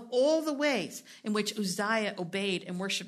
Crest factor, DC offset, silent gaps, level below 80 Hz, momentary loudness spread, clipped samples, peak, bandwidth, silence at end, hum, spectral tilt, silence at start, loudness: 16 dB; under 0.1%; none; -82 dBFS; 7 LU; under 0.1%; -14 dBFS; 13.5 kHz; 0 s; none; -4 dB/octave; 0 s; -31 LUFS